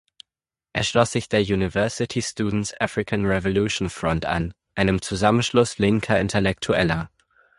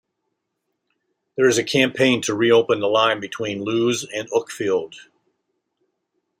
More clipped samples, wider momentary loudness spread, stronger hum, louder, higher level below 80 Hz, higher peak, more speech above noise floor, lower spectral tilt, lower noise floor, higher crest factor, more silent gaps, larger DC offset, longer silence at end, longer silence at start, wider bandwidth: neither; second, 6 LU vs 9 LU; neither; about the same, -22 LUFS vs -20 LUFS; first, -42 dBFS vs -66 dBFS; about the same, -4 dBFS vs -2 dBFS; first, over 68 dB vs 57 dB; about the same, -5 dB/octave vs -4 dB/octave; first, under -90 dBFS vs -77 dBFS; about the same, 18 dB vs 20 dB; neither; neither; second, 0.5 s vs 1.4 s; second, 0.75 s vs 1.35 s; second, 11.5 kHz vs 16 kHz